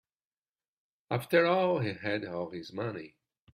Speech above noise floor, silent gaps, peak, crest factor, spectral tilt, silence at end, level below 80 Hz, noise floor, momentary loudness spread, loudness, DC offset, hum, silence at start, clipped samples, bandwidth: over 60 dB; none; -12 dBFS; 20 dB; -6.5 dB/octave; 0.45 s; -72 dBFS; under -90 dBFS; 12 LU; -31 LUFS; under 0.1%; none; 1.1 s; under 0.1%; 15.5 kHz